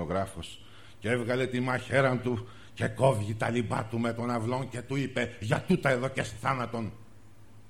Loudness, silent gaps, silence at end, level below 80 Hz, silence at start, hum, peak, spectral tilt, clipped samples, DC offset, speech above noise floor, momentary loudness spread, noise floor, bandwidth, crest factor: -30 LUFS; none; 0.1 s; -58 dBFS; 0 s; none; -10 dBFS; -6 dB/octave; under 0.1%; 0.3%; 26 dB; 11 LU; -55 dBFS; 15 kHz; 20 dB